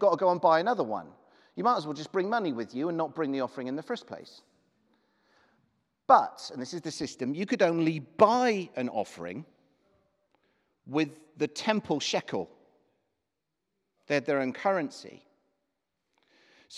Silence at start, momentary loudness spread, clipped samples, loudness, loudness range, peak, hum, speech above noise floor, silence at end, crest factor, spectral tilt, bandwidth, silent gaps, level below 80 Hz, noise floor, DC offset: 0 s; 16 LU; under 0.1%; -29 LUFS; 7 LU; -6 dBFS; none; 56 dB; 0 s; 24 dB; -5 dB/octave; 12 kHz; none; -78 dBFS; -85 dBFS; under 0.1%